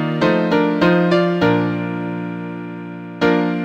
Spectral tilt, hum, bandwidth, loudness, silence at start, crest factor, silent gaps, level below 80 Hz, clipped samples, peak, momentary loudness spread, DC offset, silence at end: -8 dB/octave; none; 7.8 kHz; -17 LUFS; 0 s; 16 dB; none; -52 dBFS; under 0.1%; -2 dBFS; 14 LU; under 0.1%; 0 s